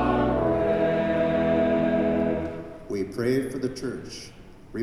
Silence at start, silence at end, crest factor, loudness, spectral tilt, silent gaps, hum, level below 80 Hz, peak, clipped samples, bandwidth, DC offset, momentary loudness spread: 0 s; 0 s; 14 dB; -25 LUFS; -7 dB/octave; none; none; -44 dBFS; -10 dBFS; under 0.1%; 13 kHz; under 0.1%; 15 LU